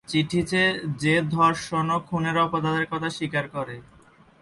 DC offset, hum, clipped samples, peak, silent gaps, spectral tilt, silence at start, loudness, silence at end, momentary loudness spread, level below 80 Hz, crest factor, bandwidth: under 0.1%; none; under 0.1%; -8 dBFS; none; -5.5 dB/octave; 0.1 s; -24 LUFS; 0.6 s; 8 LU; -56 dBFS; 18 dB; 11.5 kHz